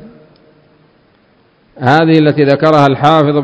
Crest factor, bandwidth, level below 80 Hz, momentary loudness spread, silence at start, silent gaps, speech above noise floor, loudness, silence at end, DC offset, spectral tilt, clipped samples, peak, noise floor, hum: 12 dB; 8 kHz; -52 dBFS; 3 LU; 0.05 s; none; 42 dB; -9 LUFS; 0 s; under 0.1%; -7.5 dB/octave; 0.7%; 0 dBFS; -51 dBFS; none